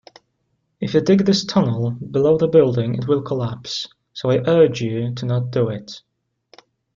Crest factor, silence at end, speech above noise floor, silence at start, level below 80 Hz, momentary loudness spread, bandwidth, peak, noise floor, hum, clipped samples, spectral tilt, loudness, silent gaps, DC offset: 18 dB; 1 s; 52 dB; 0.8 s; -54 dBFS; 12 LU; 7.6 kHz; -2 dBFS; -70 dBFS; none; under 0.1%; -7 dB/octave; -19 LUFS; none; under 0.1%